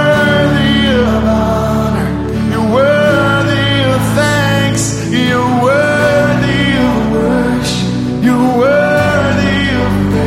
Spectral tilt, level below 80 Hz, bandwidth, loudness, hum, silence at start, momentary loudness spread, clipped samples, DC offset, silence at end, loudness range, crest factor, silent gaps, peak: -5.5 dB/octave; -28 dBFS; 16 kHz; -11 LUFS; none; 0 s; 4 LU; under 0.1%; under 0.1%; 0 s; 0 LU; 10 dB; none; 0 dBFS